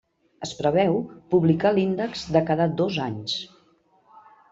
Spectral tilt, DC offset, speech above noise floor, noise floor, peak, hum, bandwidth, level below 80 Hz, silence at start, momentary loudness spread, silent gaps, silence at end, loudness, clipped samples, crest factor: -6.5 dB/octave; under 0.1%; 39 dB; -61 dBFS; -6 dBFS; none; 7.8 kHz; -58 dBFS; 0.4 s; 10 LU; none; 1.05 s; -23 LUFS; under 0.1%; 20 dB